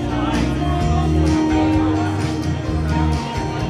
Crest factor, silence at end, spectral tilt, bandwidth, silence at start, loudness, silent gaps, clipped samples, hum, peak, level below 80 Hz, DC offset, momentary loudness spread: 12 dB; 0 s; -7 dB/octave; 11.5 kHz; 0 s; -19 LUFS; none; under 0.1%; none; -6 dBFS; -26 dBFS; under 0.1%; 5 LU